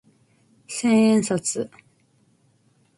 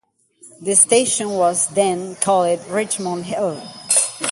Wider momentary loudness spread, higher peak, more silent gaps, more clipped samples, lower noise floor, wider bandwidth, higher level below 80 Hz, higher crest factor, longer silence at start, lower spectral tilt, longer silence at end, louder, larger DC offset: first, 15 LU vs 11 LU; second, -8 dBFS vs 0 dBFS; neither; neither; first, -62 dBFS vs -49 dBFS; about the same, 11.5 kHz vs 12 kHz; about the same, -66 dBFS vs -64 dBFS; about the same, 16 dB vs 20 dB; first, 0.7 s vs 0.45 s; first, -5 dB/octave vs -2.5 dB/octave; first, 1.3 s vs 0 s; second, -21 LUFS vs -17 LUFS; neither